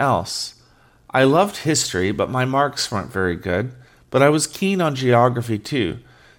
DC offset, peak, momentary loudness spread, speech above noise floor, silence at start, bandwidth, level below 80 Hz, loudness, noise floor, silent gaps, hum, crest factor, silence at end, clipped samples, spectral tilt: under 0.1%; -2 dBFS; 9 LU; 34 dB; 0 s; 17.5 kHz; -54 dBFS; -20 LUFS; -53 dBFS; none; none; 18 dB; 0.4 s; under 0.1%; -4.5 dB/octave